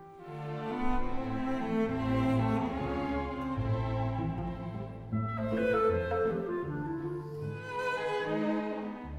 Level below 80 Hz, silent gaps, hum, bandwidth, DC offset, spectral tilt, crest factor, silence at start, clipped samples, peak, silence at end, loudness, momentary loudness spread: -46 dBFS; none; none; 11 kHz; under 0.1%; -8 dB/octave; 14 dB; 0 s; under 0.1%; -18 dBFS; 0 s; -33 LUFS; 10 LU